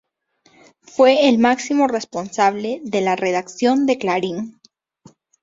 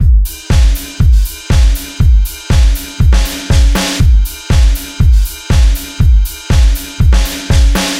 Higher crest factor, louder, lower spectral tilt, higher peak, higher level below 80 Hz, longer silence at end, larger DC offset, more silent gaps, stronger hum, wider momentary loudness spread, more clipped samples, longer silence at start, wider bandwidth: first, 18 dB vs 8 dB; second, -18 LUFS vs -12 LUFS; about the same, -4.5 dB/octave vs -5 dB/octave; about the same, -2 dBFS vs 0 dBFS; second, -64 dBFS vs -10 dBFS; first, 0.9 s vs 0 s; neither; neither; neither; first, 12 LU vs 3 LU; neither; first, 0.95 s vs 0 s; second, 7.8 kHz vs 16.5 kHz